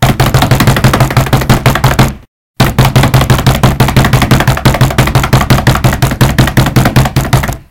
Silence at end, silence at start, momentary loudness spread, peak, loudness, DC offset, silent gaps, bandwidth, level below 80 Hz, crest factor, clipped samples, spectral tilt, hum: 0.1 s; 0 s; 3 LU; 0 dBFS; -8 LUFS; under 0.1%; 2.28-2.54 s; 17.5 kHz; -18 dBFS; 8 dB; 3%; -5.5 dB/octave; none